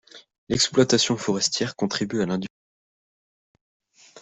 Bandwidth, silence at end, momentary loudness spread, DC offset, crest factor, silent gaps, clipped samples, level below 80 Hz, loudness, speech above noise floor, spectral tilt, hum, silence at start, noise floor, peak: 8.4 kHz; 0 s; 9 LU; under 0.1%; 22 dB; 0.38-0.47 s, 2.50-3.55 s, 3.61-3.80 s; under 0.1%; -60 dBFS; -23 LUFS; over 67 dB; -3.5 dB/octave; none; 0.15 s; under -90 dBFS; -4 dBFS